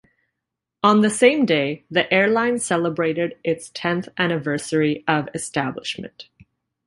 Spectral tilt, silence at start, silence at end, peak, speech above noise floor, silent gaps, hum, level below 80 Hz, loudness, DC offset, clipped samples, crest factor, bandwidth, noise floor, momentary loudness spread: -4.5 dB/octave; 0.85 s; 0.65 s; -2 dBFS; 62 dB; none; none; -62 dBFS; -20 LUFS; under 0.1%; under 0.1%; 20 dB; 11.5 kHz; -83 dBFS; 10 LU